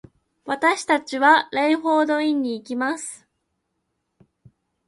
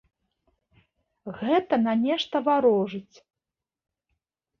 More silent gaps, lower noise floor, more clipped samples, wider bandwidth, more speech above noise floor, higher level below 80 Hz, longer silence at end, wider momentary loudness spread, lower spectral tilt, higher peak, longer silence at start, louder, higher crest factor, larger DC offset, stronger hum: neither; second, -76 dBFS vs -89 dBFS; neither; first, 11.5 kHz vs 6.8 kHz; second, 55 dB vs 65 dB; about the same, -70 dBFS vs -70 dBFS; about the same, 1.7 s vs 1.6 s; second, 14 LU vs 18 LU; second, -2.5 dB/octave vs -6.5 dB/octave; first, -2 dBFS vs -10 dBFS; second, 0.45 s vs 1.25 s; first, -20 LUFS vs -24 LUFS; about the same, 20 dB vs 18 dB; neither; neither